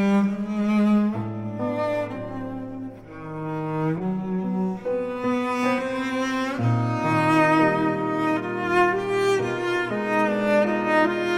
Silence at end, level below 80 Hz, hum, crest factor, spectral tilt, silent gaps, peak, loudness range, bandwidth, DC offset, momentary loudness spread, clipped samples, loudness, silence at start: 0 s; -56 dBFS; none; 16 dB; -7 dB/octave; none; -8 dBFS; 7 LU; 12.5 kHz; under 0.1%; 11 LU; under 0.1%; -23 LUFS; 0 s